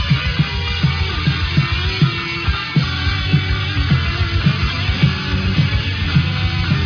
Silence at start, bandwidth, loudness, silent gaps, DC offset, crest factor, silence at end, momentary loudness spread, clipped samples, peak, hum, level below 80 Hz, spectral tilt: 0 s; 5.4 kHz; -17 LUFS; none; under 0.1%; 16 dB; 0 s; 2 LU; under 0.1%; -2 dBFS; none; -26 dBFS; -6.5 dB/octave